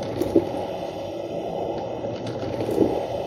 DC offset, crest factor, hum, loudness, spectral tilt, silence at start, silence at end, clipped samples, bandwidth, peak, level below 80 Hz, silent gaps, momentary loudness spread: under 0.1%; 22 dB; none; -26 LUFS; -7 dB/octave; 0 s; 0 s; under 0.1%; 16 kHz; -4 dBFS; -50 dBFS; none; 8 LU